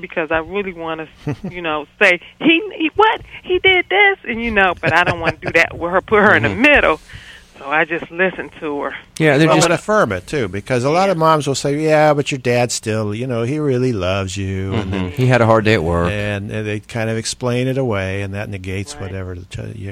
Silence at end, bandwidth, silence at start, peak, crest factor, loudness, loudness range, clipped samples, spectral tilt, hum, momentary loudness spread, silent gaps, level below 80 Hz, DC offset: 0 s; 15.5 kHz; 0 s; 0 dBFS; 16 dB; -16 LUFS; 5 LU; under 0.1%; -5 dB/octave; none; 14 LU; none; -42 dBFS; under 0.1%